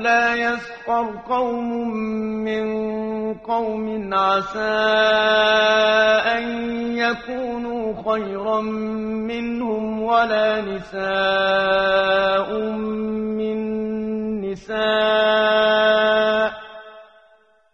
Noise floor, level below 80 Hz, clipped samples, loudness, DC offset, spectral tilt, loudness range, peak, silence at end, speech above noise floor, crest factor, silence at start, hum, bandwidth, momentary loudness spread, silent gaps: -56 dBFS; -52 dBFS; under 0.1%; -20 LUFS; under 0.1%; -5 dB/octave; 6 LU; -4 dBFS; 0.7 s; 36 dB; 16 dB; 0 s; none; 7.2 kHz; 10 LU; none